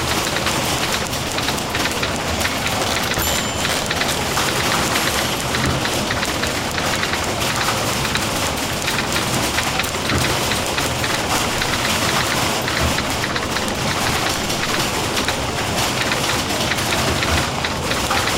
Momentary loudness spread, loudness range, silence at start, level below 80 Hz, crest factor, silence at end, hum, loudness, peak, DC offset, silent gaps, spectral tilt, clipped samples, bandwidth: 3 LU; 1 LU; 0 s; -36 dBFS; 14 dB; 0 s; none; -19 LUFS; -6 dBFS; 0.2%; none; -3 dB/octave; under 0.1%; 17 kHz